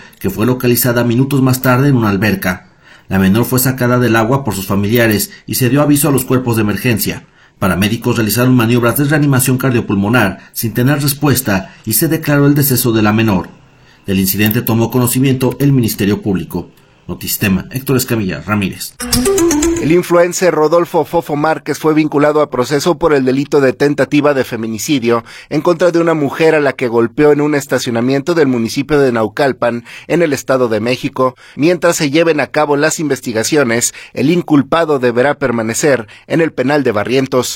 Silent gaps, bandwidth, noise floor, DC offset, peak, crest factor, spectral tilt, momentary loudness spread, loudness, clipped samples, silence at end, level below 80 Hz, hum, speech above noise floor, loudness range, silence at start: none; 16.5 kHz; -44 dBFS; under 0.1%; 0 dBFS; 12 dB; -5.5 dB/octave; 6 LU; -13 LUFS; under 0.1%; 0 s; -40 dBFS; none; 32 dB; 2 LU; 0.2 s